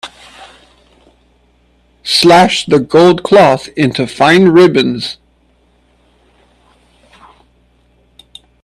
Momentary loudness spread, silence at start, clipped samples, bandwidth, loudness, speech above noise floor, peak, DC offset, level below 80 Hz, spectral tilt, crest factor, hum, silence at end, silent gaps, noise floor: 15 LU; 0.05 s; under 0.1%; 13 kHz; -9 LUFS; 44 dB; 0 dBFS; under 0.1%; -48 dBFS; -5 dB/octave; 12 dB; 60 Hz at -40 dBFS; 3.5 s; none; -52 dBFS